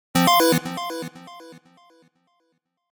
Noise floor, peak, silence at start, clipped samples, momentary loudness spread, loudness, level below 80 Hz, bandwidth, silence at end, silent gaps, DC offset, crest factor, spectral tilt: -72 dBFS; -2 dBFS; 0.15 s; under 0.1%; 26 LU; -20 LUFS; -62 dBFS; over 20 kHz; 1.35 s; none; under 0.1%; 22 dB; -4 dB/octave